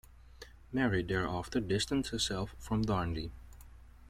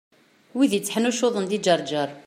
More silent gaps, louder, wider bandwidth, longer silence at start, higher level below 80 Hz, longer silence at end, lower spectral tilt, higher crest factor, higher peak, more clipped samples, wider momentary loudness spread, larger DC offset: neither; second, -34 LUFS vs -23 LUFS; about the same, 16 kHz vs 16 kHz; second, 0.1 s vs 0.55 s; first, -50 dBFS vs -72 dBFS; about the same, 0.05 s vs 0.05 s; about the same, -5 dB/octave vs -4 dB/octave; about the same, 18 dB vs 18 dB; second, -18 dBFS vs -6 dBFS; neither; first, 20 LU vs 4 LU; neither